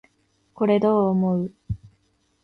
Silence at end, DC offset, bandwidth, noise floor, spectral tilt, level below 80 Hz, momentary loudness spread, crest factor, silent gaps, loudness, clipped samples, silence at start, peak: 0.65 s; under 0.1%; 5.8 kHz; -66 dBFS; -10 dB/octave; -50 dBFS; 16 LU; 16 dB; none; -22 LUFS; under 0.1%; 0.6 s; -6 dBFS